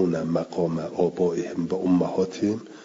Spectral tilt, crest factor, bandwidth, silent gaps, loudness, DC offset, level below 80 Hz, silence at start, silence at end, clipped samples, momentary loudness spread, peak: -7.5 dB/octave; 16 dB; 7.8 kHz; none; -25 LUFS; under 0.1%; -64 dBFS; 0 s; 0 s; under 0.1%; 5 LU; -10 dBFS